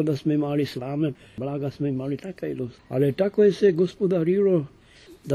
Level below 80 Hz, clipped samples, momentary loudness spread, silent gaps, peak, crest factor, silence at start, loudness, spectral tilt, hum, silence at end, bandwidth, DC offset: -60 dBFS; under 0.1%; 12 LU; none; -8 dBFS; 16 dB; 0 s; -24 LUFS; -8 dB/octave; none; 0 s; 13.5 kHz; under 0.1%